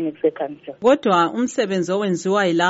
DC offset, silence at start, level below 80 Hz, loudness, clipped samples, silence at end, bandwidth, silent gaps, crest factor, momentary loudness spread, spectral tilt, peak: under 0.1%; 0 s; -64 dBFS; -20 LUFS; under 0.1%; 0 s; 8 kHz; none; 14 dB; 6 LU; -4 dB/octave; -4 dBFS